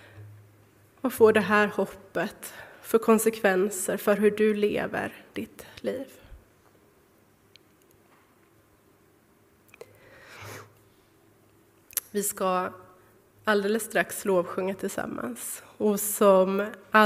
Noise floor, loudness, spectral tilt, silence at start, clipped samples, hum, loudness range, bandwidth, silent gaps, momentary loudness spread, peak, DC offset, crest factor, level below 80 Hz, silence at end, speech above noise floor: -61 dBFS; -26 LUFS; -4 dB/octave; 0.15 s; under 0.1%; none; 15 LU; 16 kHz; none; 19 LU; -4 dBFS; under 0.1%; 24 dB; -64 dBFS; 0 s; 36 dB